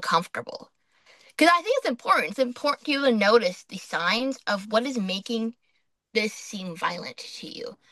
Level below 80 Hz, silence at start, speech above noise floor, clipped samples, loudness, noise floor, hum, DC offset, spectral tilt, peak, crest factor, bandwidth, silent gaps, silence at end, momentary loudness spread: -76 dBFS; 0 s; 47 dB; under 0.1%; -25 LUFS; -73 dBFS; none; under 0.1%; -4 dB/octave; -4 dBFS; 22 dB; 12.5 kHz; none; 0.15 s; 17 LU